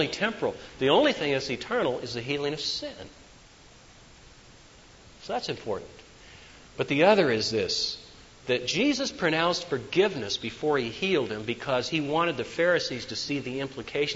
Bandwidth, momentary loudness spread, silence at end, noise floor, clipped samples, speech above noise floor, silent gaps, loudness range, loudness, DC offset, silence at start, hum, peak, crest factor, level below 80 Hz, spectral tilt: 8 kHz; 12 LU; 0 s; -53 dBFS; under 0.1%; 26 dB; none; 12 LU; -27 LUFS; under 0.1%; 0 s; none; -8 dBFS; 20 dB; -58 dBFS; -4 dB/octave